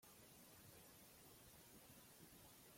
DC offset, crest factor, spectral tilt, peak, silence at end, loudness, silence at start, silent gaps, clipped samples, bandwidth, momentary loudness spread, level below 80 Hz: under 0.1%; 14 dB; -3 dB/octave; -52 dBFS; 0 s; -64 LUFS; 0 s; none; under 0.1%; 16.5 kHz; 1 LU; -82 dBFS